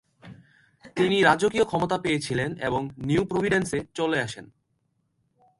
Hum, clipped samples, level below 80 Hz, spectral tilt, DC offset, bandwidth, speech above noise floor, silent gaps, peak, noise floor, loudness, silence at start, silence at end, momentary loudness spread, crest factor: none; under 0.1%; -54 dBFS; -5 dB/octave; under 0.1%; 11.5 kHz; 48 dB; none; -4 dBFS; -73 dBFS; -25 LUFS; 0.25 s; 1.15 s; 10 LU; 22 dB